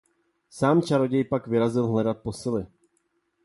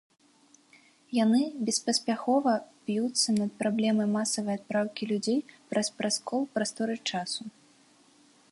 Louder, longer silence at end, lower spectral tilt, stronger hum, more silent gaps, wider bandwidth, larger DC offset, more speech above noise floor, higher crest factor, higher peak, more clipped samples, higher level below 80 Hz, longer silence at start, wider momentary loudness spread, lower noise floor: first, -25 LUFS vs -29 LUFS; second, 0.8 s vs 1.05 s; first, -7.5 dB/octave vs -3.5 dB/octave; neither; neither; about the same, 11.5 kHz vs 11.5 kHz; neither; first, 48 dB vs 33 dB; about the same, 18 dB vs 16 dB; first, -8 dBFS vs -14 dBFS; neither; first, -58 dBFS vs -76 dBFS; second, 0.55 s vs 1.1 s; about the same, 9 LU vs 7 LU; first, -72 dBFS vs -62 dBFS